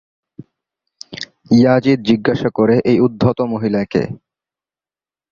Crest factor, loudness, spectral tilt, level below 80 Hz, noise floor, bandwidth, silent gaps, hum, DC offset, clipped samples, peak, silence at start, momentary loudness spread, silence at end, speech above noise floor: 16 dB; -15 LUFS; -7.5 dB/octave; -48 dBFS; under -90 dBFS; 7.2 kHz; none; none; under 0.1%; under 0.1%; -2 dBFS; 1.1 s; 17 LU; 1.15 s; over 76 dB